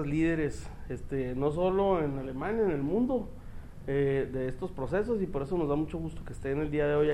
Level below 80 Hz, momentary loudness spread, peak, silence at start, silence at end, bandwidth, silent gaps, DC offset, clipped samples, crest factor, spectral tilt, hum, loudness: -44 dBFS; 13 LU; -16 dBFS; 0 s; 0 s; 12.5 kHz; none; under 0.1%; under 0.1%; 14 dB; -8 dB/octave; none; -31 LUFS